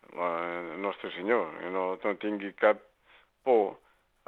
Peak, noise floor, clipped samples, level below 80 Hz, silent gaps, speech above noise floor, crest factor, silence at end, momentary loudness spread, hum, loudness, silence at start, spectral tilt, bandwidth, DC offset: -8 dBFS; -63 dBFS; under 0.1%; -76 dBFS; none; 34 dB; 22 dB; 0.5 s; 8 LU; none; -30 LUFS; 0.1 s; -7 dB/octave; 4.3 kHz; under 0.1%